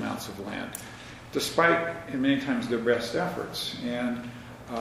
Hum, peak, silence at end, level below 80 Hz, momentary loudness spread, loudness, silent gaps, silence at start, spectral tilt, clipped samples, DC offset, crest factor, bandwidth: none; -6 dBFS; 0 s; -58 dBFS; 15 LU; -28 LUFS; none; 0 s; -4.5 dB/octave; under 0.1%; under 0.1%; 22 dB; 15.5 kHz